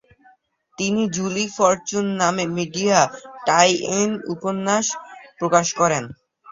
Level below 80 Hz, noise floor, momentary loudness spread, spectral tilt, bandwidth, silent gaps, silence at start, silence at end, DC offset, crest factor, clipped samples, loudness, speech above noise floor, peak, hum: -60 dBFS; -58 dBFS; 9 LU; -3.5 dB/octave; 7.8 kHz; none; 0.8 s; 0 s; under 0.1%; 20 dB; under 0.1%; -20 LUFS; 38 dB; 0 dBFS; none